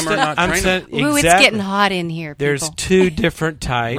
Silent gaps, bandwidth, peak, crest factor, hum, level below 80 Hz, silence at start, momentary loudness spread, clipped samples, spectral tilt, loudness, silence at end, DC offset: none; 16 kHz; 0 dBFS; 16 dB; none; -36 dBFS; 0 s; 10 LU; under 0.1%; -4 dB/octave; -16 LUFS; 0 s; under 0.1%